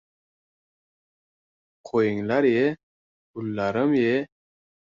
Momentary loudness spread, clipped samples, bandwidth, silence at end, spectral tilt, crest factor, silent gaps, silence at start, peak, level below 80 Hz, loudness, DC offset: 17 LU; under 0.1%; 7.4 kHz; 0.7 s; -7.5 dB/octave; 18 dB; 2.83-3.34 s; 1.85 s; -8 dBFS; -64 dBFS; -24 LUFS; under 0.1%